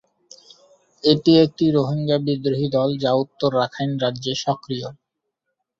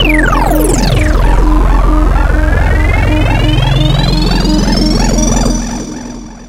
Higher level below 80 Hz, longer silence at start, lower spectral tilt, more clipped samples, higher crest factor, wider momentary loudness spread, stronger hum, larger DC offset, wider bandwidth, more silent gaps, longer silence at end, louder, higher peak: second, -60 dBFS vs -12 dBFS; first, 1.05 s vs 0 s; first, -6.5 dB/octave vs -5 dB/octave; neither; first, 20 dB vs 8 dB; first, 9 LU vs 4 LU; neither; neither; second, 7.6 kHz vs 16 kHz; neither; first, 0.85 s vs 0 s; second, -20 LUFS vs -11 LUFS; about the same, -2 dBFS vs 0 dBFS